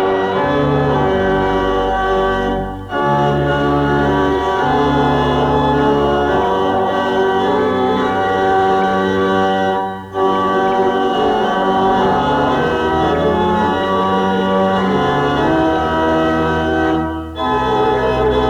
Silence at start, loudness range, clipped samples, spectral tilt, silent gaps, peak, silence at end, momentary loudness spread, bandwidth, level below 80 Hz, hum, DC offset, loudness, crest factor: 0 s; 1 LU; under 0.1%; -7 dB/octave; none; -2 dBFS; 0 s; 3 LU; 11 kHz; -34 dBFS; none; under 0.1%; -15 LUFS; 12 dB